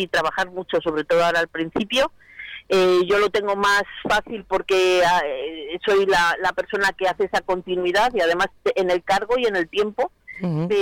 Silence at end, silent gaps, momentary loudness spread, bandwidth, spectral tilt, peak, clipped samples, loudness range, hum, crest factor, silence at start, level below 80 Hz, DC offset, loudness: 0 s; none; 9 LU; 16.5 kHz; -4 dB/octave; -12 dBFS; under 0.1%; 2 LU; none; 8 dB; 0 s; -50 dBFS; under 0.1%; -21 LUFS